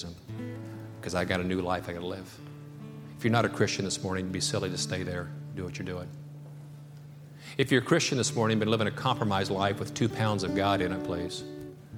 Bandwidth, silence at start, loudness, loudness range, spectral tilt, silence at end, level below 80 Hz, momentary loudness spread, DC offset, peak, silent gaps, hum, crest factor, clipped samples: 16.5 kHz; 0 s; -30 LUFS; 7 LU; -4.5 dB/octave; 0 s; -58 dBFS; 19 LU; under 0.1%; -8 dBFS; none; none; 22 dB; under 0.1%